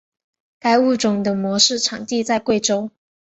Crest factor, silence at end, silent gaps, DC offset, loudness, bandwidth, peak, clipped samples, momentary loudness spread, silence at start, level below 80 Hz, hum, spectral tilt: 18 dB; 0.45 s; none; under 0.1%; -18 LUFS; 8.2 kHz; -2 dBFS; under 0.1%; 8 LU; 0.65 s; -60 dBFS; none; -3 dB/octave